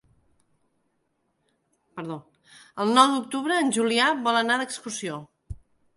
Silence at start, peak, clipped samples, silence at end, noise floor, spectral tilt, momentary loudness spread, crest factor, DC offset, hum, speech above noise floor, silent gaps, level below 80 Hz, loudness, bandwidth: 1.95 s; -2 dBFS; under 0.1%; 0.4 s; -73 dBFS; -3 dB/octave; 24 LU; 24 dB; under 0.1%; none; 49 dB; none; -56 dBFS; -23 LUFS; 11.5 kHz